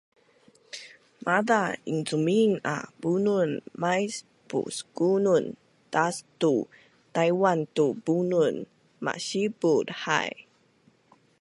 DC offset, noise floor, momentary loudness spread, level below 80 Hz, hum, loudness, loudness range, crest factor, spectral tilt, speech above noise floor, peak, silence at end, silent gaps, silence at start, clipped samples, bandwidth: under 0.1%; -63 dBFS; 15 LU; -74 dBFS; none; -26 LUFS; 2 LU; 20 dB; -5 dB/octave; 38 dB; -6 dBFS; 1 s; none; 0.75 s; under 0.1%; 11.5 kHz